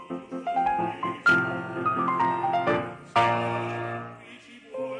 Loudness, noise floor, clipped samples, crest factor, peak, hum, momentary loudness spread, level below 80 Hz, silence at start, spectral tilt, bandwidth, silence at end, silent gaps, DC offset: -26 LUFS; -47 dBFS; under 0.1%; 16 dB; -10 dBFS; none; 16 LU; -64 dBFS; 0 s; -6 dB/octave; 10 kHz; 0 s; none; under 0.1%